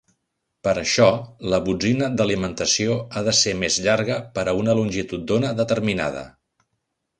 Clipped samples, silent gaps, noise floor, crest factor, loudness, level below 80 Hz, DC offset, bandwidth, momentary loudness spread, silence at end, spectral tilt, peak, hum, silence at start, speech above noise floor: under 0.1%; none; -76 dBFS; 20 dB; -21 LUFS; -48 dBFS; under 0.1%; 11 kHz; 7 LU; 0.9 s; -4 dB/octave; -2 dBFS; none; 0.65 s; 55 dB